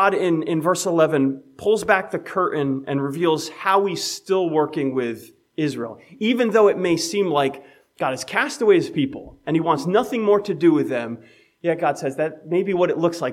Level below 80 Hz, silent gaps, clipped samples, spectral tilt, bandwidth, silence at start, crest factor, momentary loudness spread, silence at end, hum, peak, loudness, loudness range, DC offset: -62 dBFS; none; under 0.1%; -5 dB/octave; 15.5 kHz; 0 s; 18 dB; 9 LU; 0 s; none; -2 dBFS; -21 LUFS; 2 LU; under 0.1%